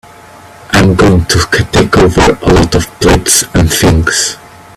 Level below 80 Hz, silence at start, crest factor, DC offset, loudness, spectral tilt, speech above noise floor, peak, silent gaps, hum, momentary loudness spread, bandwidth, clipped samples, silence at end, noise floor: -22 dBFS; 0.7 s; 10 dB; under 0.1%; -8 LUFS; -4.5 dB/octave; 26 dB; 0 dBFS; none; none; 5 LU; over 20 kHz; 0.2%; 0.4 s; -34 dBFS